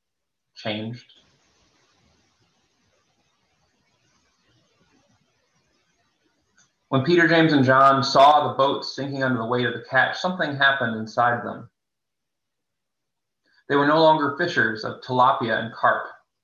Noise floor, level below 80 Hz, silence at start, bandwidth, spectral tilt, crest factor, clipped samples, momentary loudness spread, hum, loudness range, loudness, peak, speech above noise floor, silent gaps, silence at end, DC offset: -84 dBFS; -68 dBFS; 0.6 s; 8.8 kHz; -5.5 dB/octave; 20 dB; under 0.1%; 15 LU; none; 10 LU; -20 LUFS; -4 dBFS; 64 dB; none; 0.3 s; under 0.1%